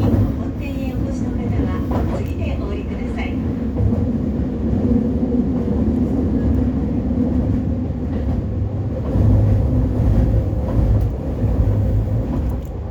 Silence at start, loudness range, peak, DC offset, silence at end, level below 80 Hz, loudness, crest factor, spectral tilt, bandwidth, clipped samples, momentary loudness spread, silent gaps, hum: 0 s; 3 LU; -4 dBFS; under 0.1%; 0 s; -24 dBFS; -20 LUFS; 14 dB; -10 dB/octave; 7.4 kHz; under 0.1%; 6 LU; none; none